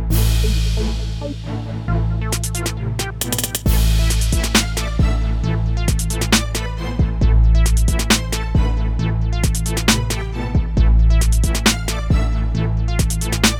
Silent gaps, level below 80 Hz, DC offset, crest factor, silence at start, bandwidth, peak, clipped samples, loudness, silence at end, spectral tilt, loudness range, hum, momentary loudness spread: none; -18 dBFS; under 0.1%; 12 dB; 0 s; 19.5 kHz; -4 dBFS; under 0.1%; -19 LUFS; 0 s; -4.5 dB/octave; 3 LU; none; 7 LU